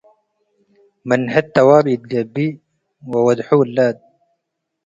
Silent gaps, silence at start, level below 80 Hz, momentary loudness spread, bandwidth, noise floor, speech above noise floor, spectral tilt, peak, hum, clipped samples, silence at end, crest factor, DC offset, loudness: none; 1.05 s; -60 dBFS; 12 LU; 7.8 kHz; -76 dBFS; 60 dB; -7.5 dB/octave; 0 dBFS; none; under 0.1%; 0.9 s; 18 dB; under 0.1%; -16 LUFS